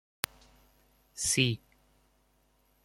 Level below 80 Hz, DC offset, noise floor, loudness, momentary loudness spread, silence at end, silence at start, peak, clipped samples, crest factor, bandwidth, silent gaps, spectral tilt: -64 dBFS; under 0.1%; -70 dBFS; -31 LUFS; 14 LU; 1.3 s; 1.15 s; -2 dBFS; under 0.1%; 34 dB; 16.5 kHz; none; -3 dB/octave